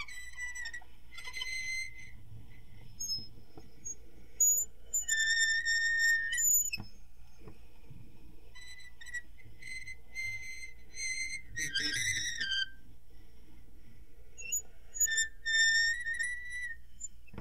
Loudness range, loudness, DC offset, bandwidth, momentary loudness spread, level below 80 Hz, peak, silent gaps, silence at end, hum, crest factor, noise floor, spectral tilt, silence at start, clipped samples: 14 LU; -31 LUFS; 0.7%; 16 kHz; 21 LU; -56 dBFS; -16 dBFS; none; 0 s; none; 20 dB; -54 dBFS; 1.5 dB/octave; 0 s; under 0.1%